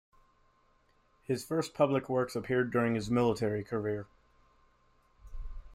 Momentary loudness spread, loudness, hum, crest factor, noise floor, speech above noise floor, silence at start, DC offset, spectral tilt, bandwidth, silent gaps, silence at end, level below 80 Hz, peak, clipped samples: 20 LU; -32 LUFS; none; 20 dB; -69 dBFS; 38 dB; 1.3 s; under 0.1%; -6.5 dB/octave; 16 kHz; none; 0 s; -52 dBFS; -14 dBFS; under 0.1%